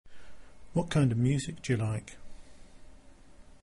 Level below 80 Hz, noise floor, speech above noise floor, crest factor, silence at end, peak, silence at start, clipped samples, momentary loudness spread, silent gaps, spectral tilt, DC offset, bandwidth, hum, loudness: -52 dBFS; -52 dBFS; 24 dB; 18 dB; 0.05 s; -14 dBFS; 0.05 s; under 0.1%; 10 LU; none; -6.5 dB/octave; under 0.1%; 11.5 kHz; none; -30 LUFS